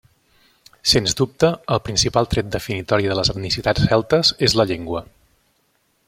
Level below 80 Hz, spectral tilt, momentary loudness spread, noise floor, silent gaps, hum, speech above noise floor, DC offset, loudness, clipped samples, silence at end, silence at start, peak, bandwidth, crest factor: -40 dBFS; -4 dB/octave; 9 LU; -65 dBFS; none; none; 46 dB; under 0.1%; -19 LUFS; under 0.1%; 1.05 s; 0.85 s; 0 dBFS; 16.5 kHz; 20 dB